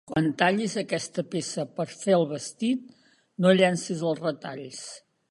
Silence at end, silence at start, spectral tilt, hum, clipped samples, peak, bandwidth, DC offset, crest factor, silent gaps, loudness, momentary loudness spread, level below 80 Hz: 0.3 s; 0.1 s; -5 dB/octave; none; under 0.1%; -6 dBFS; 11.5 kHz; under 0.1%; 20 dB; none; -26 LUFS; 16 LU; -68 dBFS